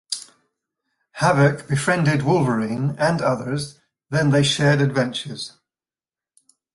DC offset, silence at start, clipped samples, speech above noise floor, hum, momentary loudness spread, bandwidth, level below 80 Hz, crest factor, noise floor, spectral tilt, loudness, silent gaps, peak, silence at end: under 0.1%; 0.1 s; under 0.1%; over 71 dB; none; 13 LU; 11.5 kHz; -54 dBFS; 18 dB; under -90 dBFS; -5.5 dB/octave; -20 LUFS; none; -4 dBFS; 1.25 s